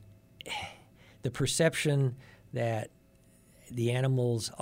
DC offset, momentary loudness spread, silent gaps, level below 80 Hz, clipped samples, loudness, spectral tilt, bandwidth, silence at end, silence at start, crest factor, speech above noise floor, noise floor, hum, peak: under 0.1%; 17 LU; none; -60 dBFS; under 0.1%; -31 LUFS; -5 dB/octave; 16 kHz; 0 s; 0 s; 20 dB; 32 dB; -61 dBFS; none; -14 dBFS